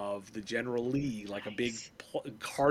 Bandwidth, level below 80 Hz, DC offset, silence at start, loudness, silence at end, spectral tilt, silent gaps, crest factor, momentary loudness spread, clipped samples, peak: 15.5 kHz; -64 dBFS; under 0.1%; 0 s; -36 LUFS; 0 s; -5 dB/octave; none; 20 dB; 8 LU; under 0.1%; -14 dBFS